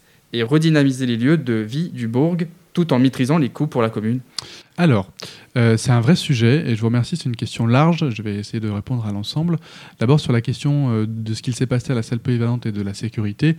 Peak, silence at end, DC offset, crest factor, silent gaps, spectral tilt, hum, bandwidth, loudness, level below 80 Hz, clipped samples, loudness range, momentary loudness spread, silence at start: 0 dBFS; 0 s; under 0.1%; 18 dB; none; -7 dB/octave; none; 12.5 kHz; -19 LUFS; -56 dBFS; under 0.1%; 3 LU; 9 LU; 0.35 s